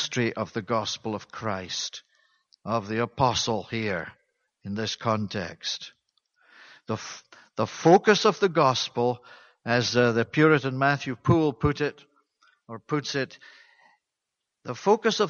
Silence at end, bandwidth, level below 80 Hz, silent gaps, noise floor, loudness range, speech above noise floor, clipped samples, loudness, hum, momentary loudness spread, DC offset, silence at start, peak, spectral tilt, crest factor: 0 s; 7.4 kHz; -54 dBFS; none; -84 dBFS; 10 LU; 59 dB; under 0.1%; -25 LUFS; none; 17 LU; under 0.1%; 0 s; -6 dBFS; -5 dB/octave; 20 dB